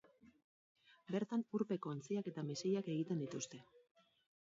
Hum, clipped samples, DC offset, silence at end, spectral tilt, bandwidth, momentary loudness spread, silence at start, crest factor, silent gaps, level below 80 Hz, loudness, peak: none; under 0.1%; under 0.1%; 0.65 s; -7 dB/octave; 7.6 kHz; 6 LU; 0.25 s; 18 dB; 0.44-0.75 s; -88 dBFS; -42 LUFS; -26 dBFS